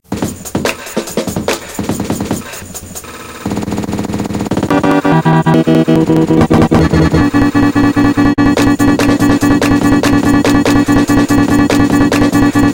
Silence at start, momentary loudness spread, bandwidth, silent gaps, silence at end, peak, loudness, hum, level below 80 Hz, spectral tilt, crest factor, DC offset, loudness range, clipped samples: 0.1 s; 10 LU; 17 kHz; none; 0 s; 0 dBFS; -11 LUFS; none; -28 dBFS; -6 dB/octave; 10 dB; under 0.1%; 9 LU; 0.2%